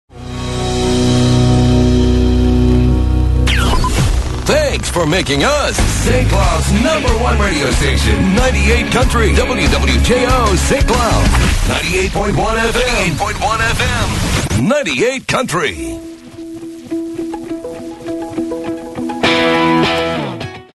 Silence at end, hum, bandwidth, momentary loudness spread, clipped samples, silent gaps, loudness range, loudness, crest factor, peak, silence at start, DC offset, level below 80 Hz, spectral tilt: 0.15 s; none; 12.5 kHz; 12 LU; under 0.1%; none; 6 LU; -14 LUFS; 12 dB; 0 dBFS; 0.15 s; under 0.1%; -18 dBFS; -5 dB/octave